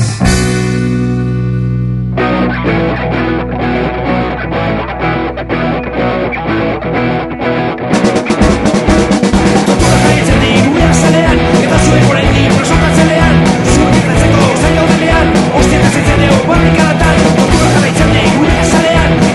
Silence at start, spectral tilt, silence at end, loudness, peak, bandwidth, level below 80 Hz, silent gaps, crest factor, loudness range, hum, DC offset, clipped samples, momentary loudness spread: 0 s; -5.5 dB/octave; 0 s; -10 LUFS; 0 dBFS; 12 kHz; -20 dBFS; none; 10 dB; 6 LU; none; under 0.1%; 0.6%; 6 LU